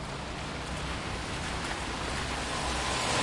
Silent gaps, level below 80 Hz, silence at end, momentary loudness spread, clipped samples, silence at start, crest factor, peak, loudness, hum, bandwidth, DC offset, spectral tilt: none; -42 dBFS; 0 s; 7 LU; under 0.1%; 0 s; 16 dB; -16 dBFS; -33 LUFS; none; 11.5 kHz; under 0.1%; -3 dB/octave